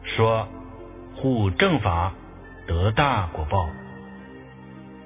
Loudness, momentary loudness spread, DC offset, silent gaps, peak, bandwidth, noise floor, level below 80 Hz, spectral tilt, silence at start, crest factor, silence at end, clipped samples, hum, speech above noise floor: -23 LUFS; 22 LU; under 0.1%; none; -4 dBFS; 3.8 kHz; -42 dBFS; -36 dBFS; -10.5 dB/octave; 0 s; 20 dB; 0 s; under 0.1%; none; 20 dB